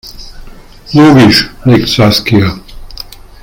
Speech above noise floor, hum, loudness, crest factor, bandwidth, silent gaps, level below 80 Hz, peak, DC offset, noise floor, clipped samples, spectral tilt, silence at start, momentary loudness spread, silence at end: 24 dB; none; -7 LUFS; 10 dB; 17 kHz; none; -30 dBFS; 0 dBFS; under 0.1%; -30 dBFS; 1%; -6 dB/octave; 0.05 s; 23 LU; 0.4 s